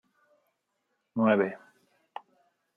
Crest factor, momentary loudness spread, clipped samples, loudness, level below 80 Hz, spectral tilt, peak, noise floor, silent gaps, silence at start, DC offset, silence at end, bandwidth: 22 dB; 22 LU; under 0.1%; -27 LUFS; -82 dBFS; -9 dB/octave; -10 dBFS; -79 dBFS; none; 1.15 s; under 0.1%; 1.2 s; 3.7 kHz